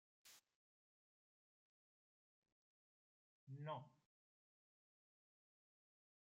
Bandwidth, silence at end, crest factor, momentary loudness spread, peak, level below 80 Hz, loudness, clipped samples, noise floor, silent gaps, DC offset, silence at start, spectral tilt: 6.4 kHz; 2.4 s; 24 dB; 16 LU; -38 dBFS; under -90 dBFS; -54 LUFS; under 0.1%; under -90 dBFS; 0.55-2.42 s, 2.52-3.47 s; under 0.1%; 0.25 s; -5.5 dB/octave